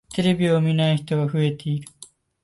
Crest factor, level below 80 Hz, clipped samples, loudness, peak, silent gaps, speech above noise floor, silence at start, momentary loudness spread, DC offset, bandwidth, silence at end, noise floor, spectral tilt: 14 dB; -56 dBFS; under 0.1%; -22 LUFS; -8 dBFS; none; 28 dB; 0.1 s; 10 LU; under 0.1%; 11.5 kHz; 0.4 s; -49 dBFS; -7 dB/octave